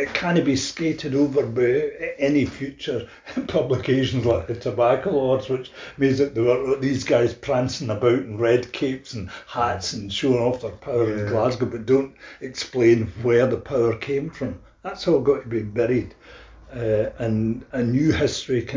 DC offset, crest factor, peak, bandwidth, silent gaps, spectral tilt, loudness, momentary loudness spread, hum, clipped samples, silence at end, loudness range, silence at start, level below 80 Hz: under 0.1%; 18 dB; -4 dBFS; 7.6 kHz; none; -6 dB/octave; -22 LUFS; 11 LU; none; under 0.1%; 0 s; 3 LU; 0 s; -46 dBFS